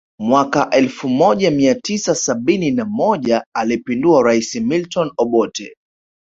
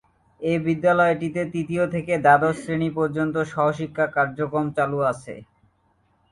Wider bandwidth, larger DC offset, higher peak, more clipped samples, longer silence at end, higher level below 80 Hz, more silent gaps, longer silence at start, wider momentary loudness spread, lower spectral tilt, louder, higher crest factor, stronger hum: second, 8 kHz vs 11.5 kHz; neither; about the same, 0 dBFS vs -2 dBFS; neither; second, 0.6 s vs 0.9 s; about the same, -56 dBFS vs -58 dBFS; first, 3.46-3.52 s vs none; second, 0.2 s vs 0.4 s; about the same, 6 LU vs 8 LU; second, -4.5 dB/octave vs -7 dB/octave; first, -16 LUFS vs -22 LUFS; about the same, 16 dB vs 20 dB; neither